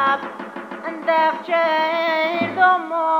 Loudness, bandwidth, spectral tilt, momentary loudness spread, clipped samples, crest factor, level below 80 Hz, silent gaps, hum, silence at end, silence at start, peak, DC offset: -19 LUFS; over 20 kHz; -5 dB/octave; 14 LU; under 0.1%; 16 dB; -76 dBFS; none; none; 0 s; 0 s; -4 dBFS; under 0.1%